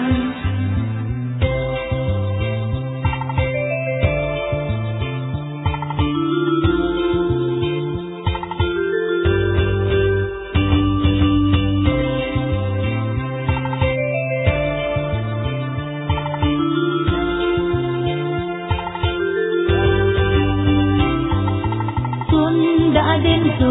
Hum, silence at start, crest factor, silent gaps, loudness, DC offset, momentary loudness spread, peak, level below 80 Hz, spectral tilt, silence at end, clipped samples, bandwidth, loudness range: none; 0 s; 16 dB; none; -19 LUFS; under 0.1%; 7 LU; -2 dBFS; -30 dBFS; -11 dB/octave; 0 s; under 0.1%; 4 kHz; 4 LU